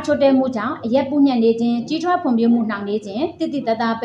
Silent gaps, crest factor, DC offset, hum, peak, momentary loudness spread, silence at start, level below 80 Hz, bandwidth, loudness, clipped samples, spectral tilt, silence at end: none; 12 dB; under 0.1%; none; -6 dBFS; 8 LU; 0 s; -62 dBFS; 7.8 kHz; -19 LUFS; under 0.1%; -6.5 dB/octave; 0 s